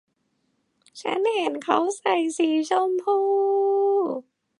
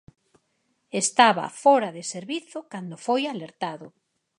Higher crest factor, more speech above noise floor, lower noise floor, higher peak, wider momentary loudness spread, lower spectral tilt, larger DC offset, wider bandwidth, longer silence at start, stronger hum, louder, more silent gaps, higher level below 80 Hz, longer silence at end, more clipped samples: second, 18 dB vs 24 dB; about the same, 49 dB vs 48 dB; about the same, -72 dBFS vs -72 dBFS; second, -6 dBFS vs -2 dBFS; second, 7 LU vs 17 LU; about the same, -3 dB/octave vs -3 dB/octave; neither; about the same, 11 kHz vs 11.5 kHz; about the same, 0.95 s vs 0.95 s; neither; about the same, -23 LUFS vs -24 LUFS; neither; about the same, -80 dBFS vs -76 dBFS; about the same, 0.4 s vs 0.5 s; neither